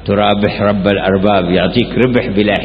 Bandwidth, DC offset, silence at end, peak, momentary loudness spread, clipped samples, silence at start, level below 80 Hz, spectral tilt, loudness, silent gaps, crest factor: 5 kHz; under 0.1%; 0 s; 0 dBFS; 2 LU; under 0.1%; 0 s; -34 dBFS; -9 dB/octave; -13 LUFS; none; 12 dB